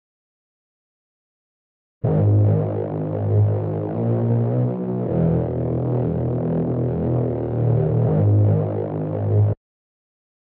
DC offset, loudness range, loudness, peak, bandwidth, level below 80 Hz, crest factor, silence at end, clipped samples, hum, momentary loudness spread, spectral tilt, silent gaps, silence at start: under 0.1%; 2 LU; -21 LUFS; -8 dBFS; 2.8 kHz; -44 dBFS; 12 dB; 0.95 s; under 0.1%; none; 7 LU; -14.5 dB/octave; none; 2.05 s